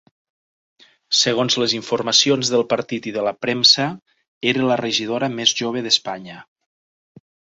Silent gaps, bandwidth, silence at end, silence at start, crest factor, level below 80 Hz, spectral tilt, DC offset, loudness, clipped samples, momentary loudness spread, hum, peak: 4.02-4.06 s, 4.28-4.41 s; 8 kHz; 1.15 s; 1.1 s; 20 dB; -64 dBFS; -2.5 dB/octave; under 0.1%; -18 LUFS; under 0.1%; 11 LU; none; 0 dBFS